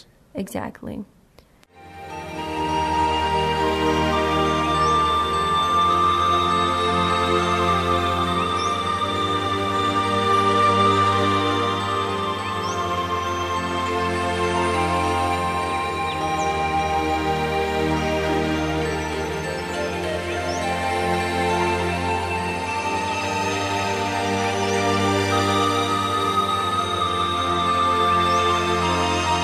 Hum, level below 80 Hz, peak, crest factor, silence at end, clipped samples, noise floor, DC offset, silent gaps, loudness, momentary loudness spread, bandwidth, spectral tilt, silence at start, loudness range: none; -44 dBFS; -6 dBFS; 16 dB; 0 s; under 0.1%; -53 dBFS; under 0.1%; none; -21 LUFS; 7 LU; 13.5 kHz; -4.5 dB/octave; 0.35 s; 4 LU